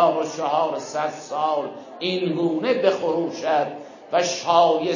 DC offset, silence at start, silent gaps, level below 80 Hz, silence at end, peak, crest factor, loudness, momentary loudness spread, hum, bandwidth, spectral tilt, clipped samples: under 0.1%; 0 s; none; -74 dBFS; 0 s; -4 dBFS; 18 dB; -22 LUFS; 9 LU; none; 7.4 kHz; -4.5 dB/octave; under 0.1%